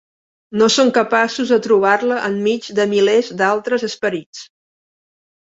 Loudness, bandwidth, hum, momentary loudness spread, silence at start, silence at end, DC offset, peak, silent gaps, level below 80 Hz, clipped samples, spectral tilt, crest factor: -16 LUFS; 8 kHz; none; 9 LU; 0.5 s; 1 s; under 0.1%; -2 dBFS; 4.26-4.33 s; -64 dBFS; under 0.1%; -3.5 dB/octave; 16 dB